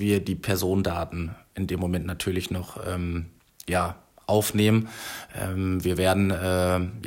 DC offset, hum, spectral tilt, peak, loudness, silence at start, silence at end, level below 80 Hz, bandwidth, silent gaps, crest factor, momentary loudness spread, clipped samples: under 0.1%; none; -5.5 dB/octave; -10 dBFS; -26 LUFS; 0 s; 0 s; -50 dBFS; 16.5 kHz; none; 16 dB; 12 LU; under 0.1%